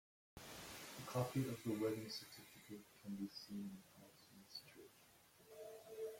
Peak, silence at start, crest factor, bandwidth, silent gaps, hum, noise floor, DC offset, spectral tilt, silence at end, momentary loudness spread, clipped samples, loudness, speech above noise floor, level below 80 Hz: -30 dBFS; 0.35 s; 20 dB; 16.5 kHz; none; none; -69 dBFS; under 0.1%; -5.5 dB/octave; 0 s; 21 LU; under 0.1%; -49 LUFS; 23 dB; -78 dBFS